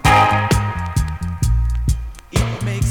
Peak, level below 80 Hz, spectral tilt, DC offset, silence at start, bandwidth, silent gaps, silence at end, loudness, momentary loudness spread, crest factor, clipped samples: 0 dBFS; -22 dBFS; -5 dB/octave; under 0.1%; 0.05 s; 18.5 kHz; none; 0 s; -19 LUFS; 10 LU; 16 dB; under 0.1%